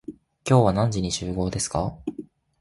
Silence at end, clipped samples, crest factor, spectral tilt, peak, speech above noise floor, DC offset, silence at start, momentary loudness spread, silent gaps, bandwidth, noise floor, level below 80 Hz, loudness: 0.4 s; under 0.1%; 18 dB; -5.5 dB/octave; -6 dBFS; 20 dB; under 0.1%; 0.1 s; 17 LU; none; 11.5 kHz; -42 dBFS; -44 dBFS; -23 LUFS